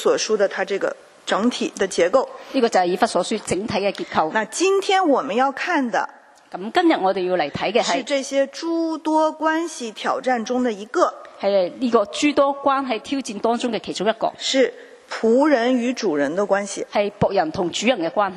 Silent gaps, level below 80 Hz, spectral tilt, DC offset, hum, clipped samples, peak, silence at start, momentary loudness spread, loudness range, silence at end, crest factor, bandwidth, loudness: none; -60 dBFS; -4 dB/octave; under 0.1%; none; under 0.1%; -2 dBFS; 0 s; 6 LU; 2 LU; 0 s; 18 dB; 12.5 kHz; -21 LUFS